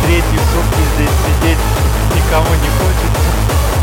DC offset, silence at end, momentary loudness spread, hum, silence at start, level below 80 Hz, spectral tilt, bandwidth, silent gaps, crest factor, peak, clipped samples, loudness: 0.2%; 0 s; 1 LU; none; 0 s; -14 dBFS; -5 dB/octave; 17.5 kHz; none; 12 dB; 0 dBFS; under 0.1%; -13 LUFS